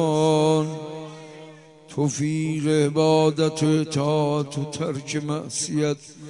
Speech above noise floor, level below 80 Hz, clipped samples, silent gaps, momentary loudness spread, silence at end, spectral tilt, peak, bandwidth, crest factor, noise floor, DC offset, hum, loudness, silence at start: 23 dB; -66 dBFS; under 0.1%; none; 16 LU; 0 s; -5.5 dB/octave; -8 dBFS; 11 kHz; 16 dB; -45 dBFS; under 0.1%; none; -23 LUFS; 0 s